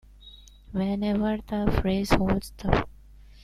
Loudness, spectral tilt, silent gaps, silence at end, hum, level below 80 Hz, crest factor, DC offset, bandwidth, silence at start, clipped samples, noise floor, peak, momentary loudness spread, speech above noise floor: -27 LUFS; -7 dB/octave; none; 0.1 s; 50 Hz at -40 dBFS; -36 dBFS; 22 dB; under 0.1%; 14.5 kHz; 0.2 s; under 0.1%; -49 dBFS; -4 dBFS; 6 LU; 25 dB